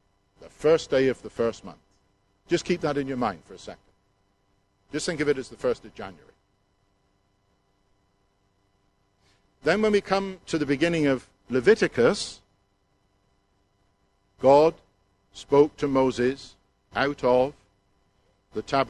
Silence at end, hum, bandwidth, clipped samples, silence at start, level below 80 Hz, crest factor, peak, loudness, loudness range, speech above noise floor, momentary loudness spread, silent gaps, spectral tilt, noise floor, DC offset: 0 s; none; 11.5 kHz; under 0.1%; 0.4 s; -56 dBFS; 22 dB; -6 dBFS; -24 LUFS; 8 LU; 45 dB; 18 LU; none; -5.5 dB/octave; -69 dBFS; under 0.1%